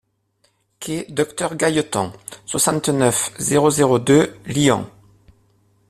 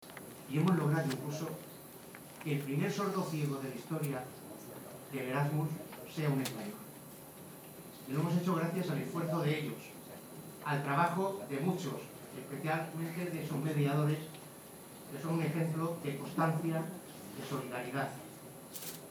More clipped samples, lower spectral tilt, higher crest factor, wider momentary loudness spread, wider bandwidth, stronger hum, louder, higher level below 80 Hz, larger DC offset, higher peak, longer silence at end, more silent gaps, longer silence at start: neither; second, -4.5 dB/octave vs -6.5 dB/octave; about the same, 18 dB vs 20 dB; second, 12 LU vs 17 LU; second, 15 kHz vs over 20 kHz; neither; first, -18 LUFS vs -36 LUFS; first, -54 dBFS vs -76 dBFS; neither; first, -2 dBFS vs -18 dBFS; first, 1 s vs 0 s; neither; first, 0.8 s vs 0 s